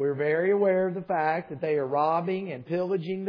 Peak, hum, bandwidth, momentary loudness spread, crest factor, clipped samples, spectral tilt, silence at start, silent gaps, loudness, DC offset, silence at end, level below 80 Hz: -12 dBFS; none; 5.2 kHz; 7 LU; 14 dB; under 0.1%; -9.5 dB/octave; 0 s; none; -27 LUFS; under 0.1%; 0 s; -76 dBFS